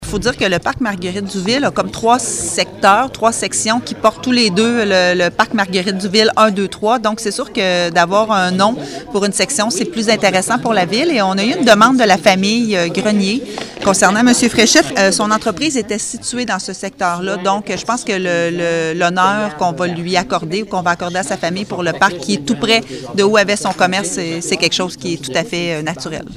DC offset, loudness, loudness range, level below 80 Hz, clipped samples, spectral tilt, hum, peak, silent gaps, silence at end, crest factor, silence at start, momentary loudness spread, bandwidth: under 0.1%; -14 LUFS; 4 LU; -46 dBFS; under 0.1%; -3.5 dB/octave; none; 0 dBFS; none; 0 s; 14 dB; 0 s; 9 LU; 15.5 kHz